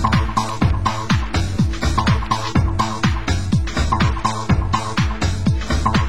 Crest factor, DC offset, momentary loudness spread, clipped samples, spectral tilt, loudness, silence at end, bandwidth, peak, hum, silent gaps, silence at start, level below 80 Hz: 14 dB; 3%; 3 LU; under 0.1%; -5.5 dB/octave; -19 LUFS; 0 s; 16 kHz; -4 dBFS; none; none; 0 s; -24 dBFS